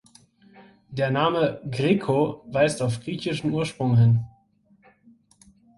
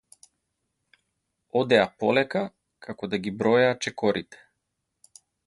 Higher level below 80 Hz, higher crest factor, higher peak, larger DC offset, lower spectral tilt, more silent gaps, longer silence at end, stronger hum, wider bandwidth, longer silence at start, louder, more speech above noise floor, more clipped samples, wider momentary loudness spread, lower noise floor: first, -56 dBFS vs -64 dBFS; second, 18 dB vs 24 dB; about the same, -6 dBFS vs -4 dBFS; neither; first, -6.5 dB/octave vs -5 dB/octave; neither; first, 1.5 s vs 1.1 s; neither; about the same, 11.5 kHz vs 11.5 kHz; second, 0.6 s vs 1.55 s; about the same, -23 LUFS vs -25 LUFS; second, 39 dB vs 56 dB; neither; second, 9 LU vs 15 LU; second, -61 dBFS vs -80 dBFS